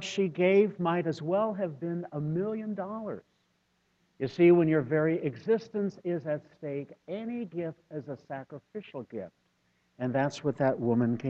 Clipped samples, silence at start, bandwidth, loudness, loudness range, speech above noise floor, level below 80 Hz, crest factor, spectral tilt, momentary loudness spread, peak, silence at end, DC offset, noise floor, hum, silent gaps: under 0.1%; 0 s; 7.8 kHz; -30 LUFS; 10 LU; 44 dB; -70 dBFS; 18 dB; -7.5 dB/octave; 17 LU; -12 dBFS; 0 s; under 0.1%; -73 dBFS; none; none